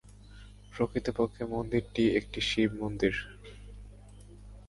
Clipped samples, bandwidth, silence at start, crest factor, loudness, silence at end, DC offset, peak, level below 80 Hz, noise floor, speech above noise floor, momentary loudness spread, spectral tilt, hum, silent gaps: under 0.1%; 11.5 kHz; 0.05 s; 20 dB; -31 LUFS; 0.05 s; under 0.1%; -12 dBFS; -50 dBFS; -51 dBFS; 20 dB; 23 LU; -5.5 dB/octave; 50 Hz at -50 dBFS; none